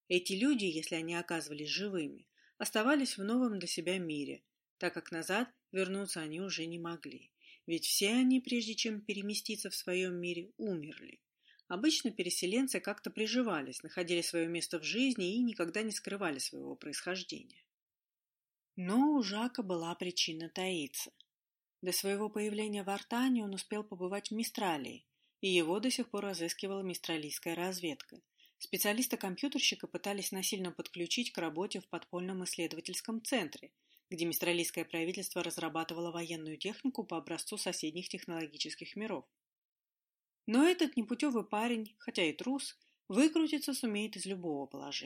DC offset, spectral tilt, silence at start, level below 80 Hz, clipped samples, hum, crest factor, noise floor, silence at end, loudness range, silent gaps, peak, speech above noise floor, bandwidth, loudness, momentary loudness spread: under 0.1%; -3.5 dB/octave; 0.1 s; -86 dBFS; under 0.1%; none; 20 dB; under -90 dBFS; 0 s; 4 LU; 4.70-4.77 s, 17.74-17.87 s, 39.47-39.76 s; -16 dBFS; over 54 dB; 16 kHz; -36 LUFS; 11 LU